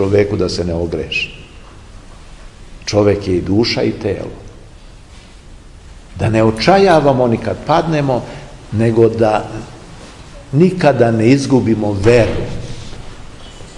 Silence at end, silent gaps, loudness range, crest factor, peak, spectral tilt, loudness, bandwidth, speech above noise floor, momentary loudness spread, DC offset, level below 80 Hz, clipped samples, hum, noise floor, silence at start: 0 s; none; 5 LU; 16 dB; 0 dBFS; -6.5 dB/octave; -14 LUFS; 11.5 kHz; 24 dB; 23 LU; 0.2%; -36 dBFS; under 0.1%; none; -37 dBFS; 0 s